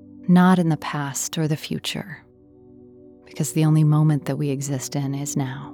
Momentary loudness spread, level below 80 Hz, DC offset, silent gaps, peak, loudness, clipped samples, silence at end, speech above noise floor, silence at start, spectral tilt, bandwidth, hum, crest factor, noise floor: 11 LU; -62 dBFS; under 0.1%; none; -8 dBFS; -21 LUFS; under 0.1%; 0 s; 29 dB; 0.1 s; -6 dB/octave; 17.5 kHz; none; 14 dB; -50 dBFS